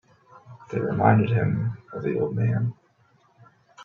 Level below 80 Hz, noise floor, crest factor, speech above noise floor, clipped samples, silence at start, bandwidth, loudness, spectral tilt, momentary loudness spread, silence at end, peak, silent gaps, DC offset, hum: -58 dBFS; -62 dBFS; 20 dB; 39 dB; under 0.1%; 0.45 s; 4.1 kHz; -24 LUFS; -10 dB/octave; 11 LU; 0 s; -6 dBFS; none; under 0.1%; none